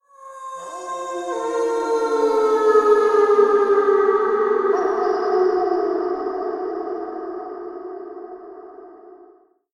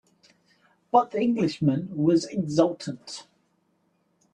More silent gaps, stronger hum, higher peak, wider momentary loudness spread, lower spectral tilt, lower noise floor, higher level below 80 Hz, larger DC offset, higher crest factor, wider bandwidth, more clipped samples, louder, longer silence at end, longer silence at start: neither; neither; about the same, -4 dBFS vs -6 dBFS; first, 19 LU vs 14 LU; second, -3.5 dB/octave vs -6.5 dB/octave; second, -52 dBFS vs -70 dBFS; about the same, -64 dBFS vs -66 dBFS; neither; about the same, 16 dB vs 20 dB; about the same, 11 kHz vs 10 kHz; neither; first, -19 LUFS vs -25 LUFS; second, 0.55 s vs 1.1 s; second, 0.2 s vs 0.95 s